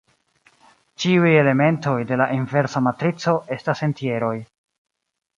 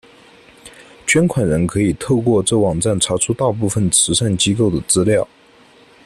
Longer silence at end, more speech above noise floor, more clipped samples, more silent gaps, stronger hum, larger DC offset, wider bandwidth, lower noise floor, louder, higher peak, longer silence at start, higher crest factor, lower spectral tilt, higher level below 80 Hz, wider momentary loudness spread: first, 0.95 s vs 0.8 s; first, 40 dB vs 32 dB; neither; neither; neither; neither; second, 7.6 kHz vs 14 kHz; first, -60 dBFS vs -48 dBFS; second, -20 LUFS vs -16 LUFS; about the same, -4 dBFS vs -2 dBFS; first, 1 s vs 0.65 s; about the same, 18 dB vs 16 dB; first, -7 dB/octave vs -4 dB/octave; second, -64 dBFS vs -44 dBFS; first, 9 LU vs 4 LU